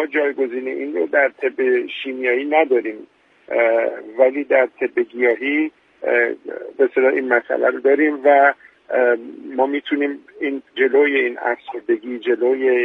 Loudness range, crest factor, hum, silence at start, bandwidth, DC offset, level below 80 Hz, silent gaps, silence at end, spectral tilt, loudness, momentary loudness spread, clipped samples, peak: 3 LU; 18 dB; none; 0 s; 4 kHz; under 0.1%; -72 dBFS; none; 0 s; -6 dB/octave; -19 LUFS; 10 LU; under 0.1%; -2 dBFS